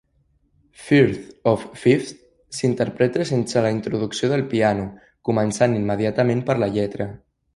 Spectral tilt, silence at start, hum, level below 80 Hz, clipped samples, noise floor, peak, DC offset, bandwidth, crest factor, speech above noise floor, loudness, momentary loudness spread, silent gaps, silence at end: -6.5 dB/octave; 0.8 s; none; -52 dBFS; under 0.1%; -64 dBFS; -2 dBFS; under 0.1%; 11.5 kHz; 18 dB; 44 dB; -21 LUFS; 10 LU; none; 0.4 s